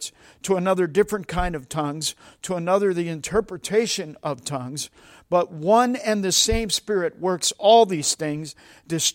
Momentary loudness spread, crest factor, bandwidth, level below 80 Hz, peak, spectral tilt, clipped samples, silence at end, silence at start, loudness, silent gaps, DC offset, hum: 12 LU; 20 dB; 16.5 kHz; -42 dBFS; -4 dBFS; -3.5 dB/octave; under 0.1%; 0.05 s; 0 s; -22 LUFS; none; under 0.1%; none